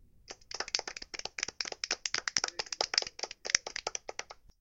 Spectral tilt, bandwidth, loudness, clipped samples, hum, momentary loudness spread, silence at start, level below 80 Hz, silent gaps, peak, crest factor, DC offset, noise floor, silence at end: 1 dB/octave; 16.5 kHz; -34 LUFS; under 0.1%; none; 14 LU; 0.3 s; -64 dBFS; none; -2 dBFS; 36 dB; under 0.1%; -53 dBFS; 0.3 s